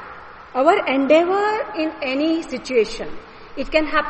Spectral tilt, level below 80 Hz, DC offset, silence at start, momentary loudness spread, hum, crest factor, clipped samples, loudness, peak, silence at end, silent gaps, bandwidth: -4 dB/octave; -44 dBFS; under 0.1%; 0 s; 19 LU; none; 18 dB; under 0.1%; -19 LUFS; 0 dBFS; 0 s; none; 8.8 kHz